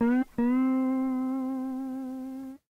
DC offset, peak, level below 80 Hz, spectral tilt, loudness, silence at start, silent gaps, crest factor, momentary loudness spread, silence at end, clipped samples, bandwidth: under 0.1%; -18 dBFS; -62 dBFS; -7.5 dB/octave; -29 LUFS; 0 s; none; 12 dB; 12 LU; 0.2 s; under 0.1%; 3.6 kHz